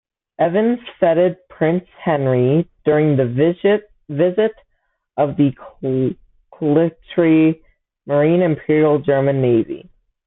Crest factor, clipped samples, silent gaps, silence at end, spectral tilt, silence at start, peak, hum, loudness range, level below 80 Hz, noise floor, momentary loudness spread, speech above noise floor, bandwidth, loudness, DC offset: 16 dB; under 0.1%; none; 0.5 s; -13 dB/octave; 0.4 s; -2 dBFS; none; 3 LU; -56 dBFS; -68 dBFS; 8 LU; 52 dB; 4 kHz; -17 LUFS; under 0.1%